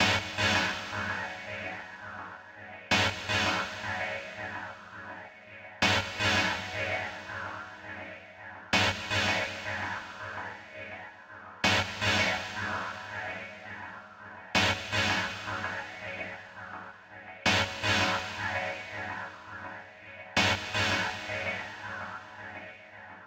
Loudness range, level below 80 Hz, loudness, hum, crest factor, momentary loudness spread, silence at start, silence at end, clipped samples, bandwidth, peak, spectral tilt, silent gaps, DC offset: 1 LU; -60 dBFS; -30 LUFS; none; 22 dB; 19 LU; 0 s; 0 s; under 0.1%; 16 kHz; -10 dBFS; -3 dB/octave; none; under 0.1%